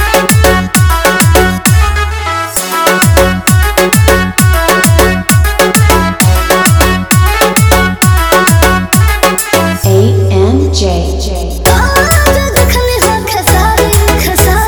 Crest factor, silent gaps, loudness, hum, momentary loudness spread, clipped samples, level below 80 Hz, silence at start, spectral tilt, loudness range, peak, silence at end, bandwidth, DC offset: 8 dB; none; -8 LUFS; none; 4 LU; 1%; -14 dBFS; 0 s; -4.5 dB/octave; 2 LU; 0 dBFS; 0 s; over 20 kHz; under 0.1%